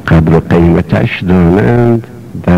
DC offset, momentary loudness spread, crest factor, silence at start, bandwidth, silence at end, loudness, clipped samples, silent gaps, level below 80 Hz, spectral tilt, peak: under 0.1%; 7 LU; 6 dB; 0 s; 7 kHz; 0 s; -9 LUFS; under 0.1%; none; -26 dBFS; -9 dB/octave; -2 dBFS